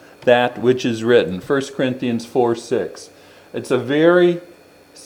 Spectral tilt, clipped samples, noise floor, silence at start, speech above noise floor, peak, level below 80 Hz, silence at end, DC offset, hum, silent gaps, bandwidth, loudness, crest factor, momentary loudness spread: -6 dB/octave; under 0.1%; -46 dBFS; 0.2 s; 29 dB; 0 dBFS; -62 dBFS; 0 s; under 0.1%; none; none; 14 kHz; -18 LUFS; 18 dB; 14 LU